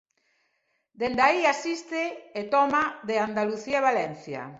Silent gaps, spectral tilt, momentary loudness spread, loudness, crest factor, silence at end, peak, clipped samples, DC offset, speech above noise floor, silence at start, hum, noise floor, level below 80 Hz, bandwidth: none; -4 dB/octave; 10 LU; -26 LUFS; 20 dB; 0 s; -6 dBFS; under 0.1%; under 0.1%; 48 dB; 1 s; none; -74 dBFS; -66 dBFS; 8 kHz